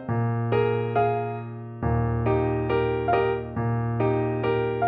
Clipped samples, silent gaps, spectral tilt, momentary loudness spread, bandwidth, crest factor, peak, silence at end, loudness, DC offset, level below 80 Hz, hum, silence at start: under 0.1%; none; -11 dB/octave; 5 LU; 4.6 kHz; 16 dB; -8 dBFS; 0 s; -25 LUFS; under 0.1%; -42 dBFS; none; 0 s